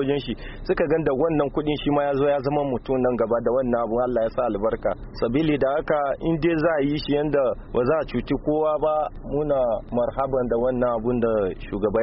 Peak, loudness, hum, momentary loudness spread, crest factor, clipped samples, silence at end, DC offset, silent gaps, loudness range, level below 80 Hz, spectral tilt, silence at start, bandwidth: -8 dBFS; -23 LUFS; none; 5 LU; 14 dB; under 0.1%; 0 s; under 0.1%; none; 1 LU; -40 dBFS; -6 dB/octave; 0 s; 5.8 kHz